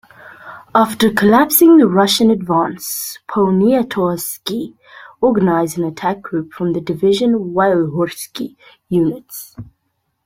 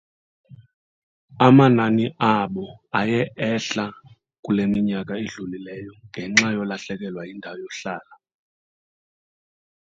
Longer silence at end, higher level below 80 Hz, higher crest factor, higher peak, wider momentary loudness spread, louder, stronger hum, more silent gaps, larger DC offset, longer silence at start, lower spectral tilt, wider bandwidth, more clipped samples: second, 0.6 s vs 1.9 s; first, -54 dBFS vs -60 dBFS; second, 16 dB vs 24 dB; about the same, 0 dBFS vs 0 dBFS; second, 16 LU vs 19 LU; first, -15 LUFS vs -21 LUFS; neither; second, none vs 0.74-1.28 s, 4.39-4.43 s; neither; second, 0.25 s vs 0.5 s; about the same, -5 dB/octave vs -5.5 dB/octave; first, 16.5 kHz vs 7.8 kHz; neither